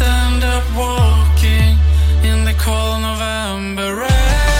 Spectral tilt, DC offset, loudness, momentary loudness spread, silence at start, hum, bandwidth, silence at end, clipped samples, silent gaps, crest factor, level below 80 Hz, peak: -5 dB/octave; under 0.1%; -15 LUFS; 7 LU; 0 s; none; 16 kHz; 0 s; under 0.1%; none; 12 dB; -14 dBFS; -2 dBFS